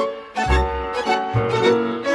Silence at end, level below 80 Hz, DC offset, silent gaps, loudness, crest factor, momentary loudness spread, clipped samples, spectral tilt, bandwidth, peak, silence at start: 0 s; -28 dBFS; under 0.1%; none; -20 LUFS; 14 dB; 6 LU; under 0.1%; -6 dB/octave; 11.5 kHz; -6 dBFS; 0 s